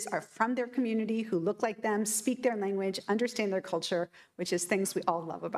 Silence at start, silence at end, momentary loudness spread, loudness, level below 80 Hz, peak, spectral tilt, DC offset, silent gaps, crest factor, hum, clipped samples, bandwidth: 0 s; 0 s; 5 LU; -32 LUFS; -80 dBFS; -12 dBFS; -4 dB/octave; under 0.1%; none; 18 dB; none; under 0.1%; 15.5 kHz